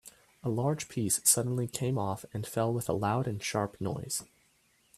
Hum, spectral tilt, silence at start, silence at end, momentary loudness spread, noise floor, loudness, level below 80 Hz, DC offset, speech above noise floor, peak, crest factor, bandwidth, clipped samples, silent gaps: none; -4.5 dB/octave; 0.05 s; 0.75 s; 11 LU; -69 dBFS; -31 LUFS; -64 dBFS; under 0.1%; 37 dB; -10 dBFS; 22 dB; 15.5 kHz; under 0.1%; none